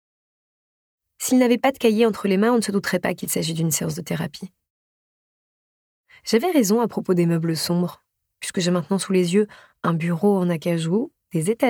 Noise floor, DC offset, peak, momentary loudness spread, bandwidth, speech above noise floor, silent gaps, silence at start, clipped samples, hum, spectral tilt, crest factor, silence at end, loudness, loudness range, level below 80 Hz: under -90 dBFS; under 0.1%; -4 dBFS; 10 LU; 18.5 kHz; over 69 dB; 4.70-6.04 s; 1.2 s; under 0.1%; none; -5.5 dB/octave; 18 dB; 0 s; -21 LUFS; 5 LU; -66 dBFS